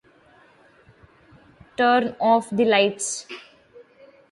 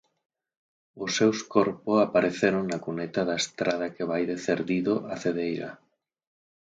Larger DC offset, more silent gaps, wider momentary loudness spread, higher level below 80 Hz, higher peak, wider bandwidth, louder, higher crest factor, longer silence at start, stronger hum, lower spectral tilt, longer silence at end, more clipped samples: neither; neither; first, 19 LU vs 8 LU; about the same, -66 dBFS vs -66 dBFS; about the same, -6 dBFS vs -6 dBFS; first, 11.5 kHz vs 9.4 kHz; first, -21 LUFS vs -27 LUFS; about the same, 18 dB vs 20 dB; first, 1.8 s vs 0.95 s; neither; second, -3 dB/octave vs -4.5 dB/octave; about the same, 0.9 s vs 0.85 s; neither